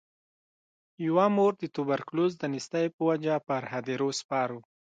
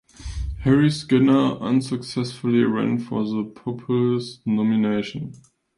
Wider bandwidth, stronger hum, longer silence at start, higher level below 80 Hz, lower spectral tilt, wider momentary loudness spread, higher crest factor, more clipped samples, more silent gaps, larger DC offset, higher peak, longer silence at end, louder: second, 9.4 kHz vs 11.5 kHz; neither; first, 1 s vs 0.2 s; second, -80 dBFS vs -40 dBFS; about the same, -6 dB/octave vs -7 dB/octave; second, 9 LU vs 14 LU; about the same, 18 dB vs 16 dB; neither; first, 2.93-2.99 s, 4.24-4.29 s vs none; neither; second, -12 dBFS vs -6 dBFS; about the same, 0.35 s vs 0.4 s; second, -29 LUFS vs -22 LUFS